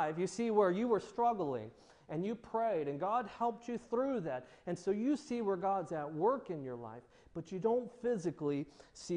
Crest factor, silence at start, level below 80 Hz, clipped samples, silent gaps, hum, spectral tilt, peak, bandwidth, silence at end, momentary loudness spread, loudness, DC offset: 18 dB; 0 s; -72 dBFS; under 0.1%; none; none; -6.5 dB/octave; -18 dBFS; 10 kHz; 0 s; 12 LU; -37 LUFS; under 0.1%